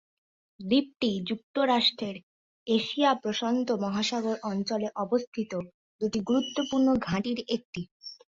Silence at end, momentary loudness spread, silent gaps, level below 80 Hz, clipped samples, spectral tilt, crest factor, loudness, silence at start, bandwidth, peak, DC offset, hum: 0.25 s; 13 LU; 1.43-1.54 s, 2.23-2.66 s, 5.27-5.32 s, 5.74-5.99 s, 7.65-7.73 s, 7.91-8.00 s; -64 dBFS; under 0.1%; -5 dB/octave; 18 dB; -28 LUFS; 0.6 s; 7.8 kHz; -12 dBFS; under 0.1%; none